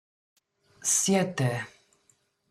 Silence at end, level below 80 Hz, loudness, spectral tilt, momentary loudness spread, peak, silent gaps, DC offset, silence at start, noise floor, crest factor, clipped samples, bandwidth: 0.8 s; -68 dBFS; -26 LUFS; -3.5 dB/octave; 13 LU; -12 dBFS; none; under 0.1%; 0.8 s; -69 dBFS; 20 dB; under 0.1%; 15 kHz